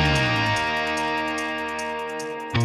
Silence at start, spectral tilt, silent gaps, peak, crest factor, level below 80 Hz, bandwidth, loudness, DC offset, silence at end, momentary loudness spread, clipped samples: 0 s; -4.5 dB/octave; none; -8 dBFS; 16 dB; -40 dBFS; 14.5 kHz; -24 LUFS; under 0.1%; 0 s; 9 LU; under 0.1%